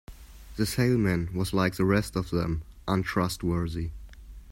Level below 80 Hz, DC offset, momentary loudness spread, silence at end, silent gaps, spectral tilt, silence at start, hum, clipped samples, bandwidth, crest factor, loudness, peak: -44 dBFS; under 0.1%; 11 LU; 0 s; none; -6 dB/octave; 0.1 s; none; under 0.1%; 16.5 kHz; 18 dB; -28 LUFS; -10 dBFS